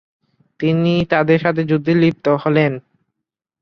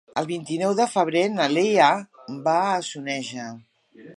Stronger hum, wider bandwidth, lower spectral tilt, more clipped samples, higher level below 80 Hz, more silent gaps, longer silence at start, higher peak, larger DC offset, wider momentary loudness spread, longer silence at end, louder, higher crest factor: neither; second, 6.4 kHz vs 11.5 kHz; first, -8.5 dB/octave vs -4.5 dB/octave; neither; first, -54 dBFS vs -76 dBFS; neither; first, 0.6 s vs 0.15 s; first, 0 dBFS vs -4 dBFS; neither; second, 5 LU vs 13 LU; first, 0.85 s vs 0.05 s; first, -16 LUFS vs -22 LUFS; about the same, 16 dB vs 20 dB